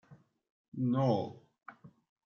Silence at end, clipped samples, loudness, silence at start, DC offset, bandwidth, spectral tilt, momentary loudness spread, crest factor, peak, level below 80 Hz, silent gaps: 0.4 s; under 0.1%; -33 LUFS; 0.1 s; under 0.1%; 6.6 kHz; -9.5 dB/octave; 24 LU; 20 dB; -18 dBFS; -80 dBFS; 0.50-0.72 s